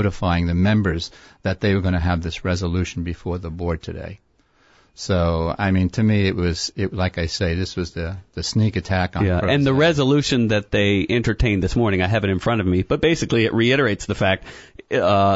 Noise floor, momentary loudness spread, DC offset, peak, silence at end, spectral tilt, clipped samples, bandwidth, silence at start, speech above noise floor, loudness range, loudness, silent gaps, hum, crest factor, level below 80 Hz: -58 dBFS; 10 LU; under 0.1%; -4 dBFS; 0 s; -6 dB/octave; under 0.1%; 8 kHz; 0 s; 39 dB; 6 LU; -20 LUFS; none; none; 16 dB; -36 dBFS